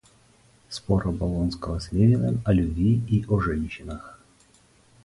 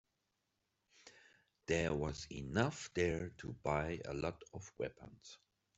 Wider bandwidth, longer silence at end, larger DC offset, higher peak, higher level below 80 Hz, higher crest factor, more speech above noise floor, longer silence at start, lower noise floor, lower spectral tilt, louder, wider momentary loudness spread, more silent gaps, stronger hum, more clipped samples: first, 11.5 kHz vs 8.2 kHz; first, 0.9 s vs 0.4 s; neither; first, -8 dBFS vs -18 dBFS; first, -38 dBFS vs -60 dBFS; second, 18 dB vs 24 dB; second, 35 dB vs 45 dB; second, 0.7 s vs 1.05 s; second, -58 dBFS vs -86 dBFS; first, -8 dB/octave vs -5.5 dB/octave; first, -24 LUFS vs -40 LUFS; second, 16 LU vs 20 LU; neither; neither; neither